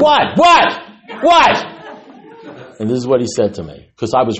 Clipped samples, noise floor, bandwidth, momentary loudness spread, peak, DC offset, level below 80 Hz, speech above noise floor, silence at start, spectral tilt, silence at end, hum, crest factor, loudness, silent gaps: under 0.1%; -38 dBFS; 8.4 kHz; 21 LU; 0 dBFS; under 0.1%; -48 dBFS; 25 dB; 0 s; -4.5 dB/octave; 0 s; none; 14 dB; -13 LUFS; none